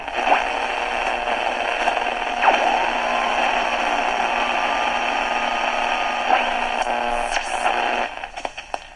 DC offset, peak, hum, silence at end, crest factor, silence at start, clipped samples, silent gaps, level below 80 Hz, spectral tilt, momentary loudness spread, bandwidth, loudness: under 0.1%; -2 dBFS; none; 0 s; 20 dB; 0 s; under 0.1%; none; -44 dBFS; -1.5 dB/octave; 4 LU; 11 kHz; -21 LUFS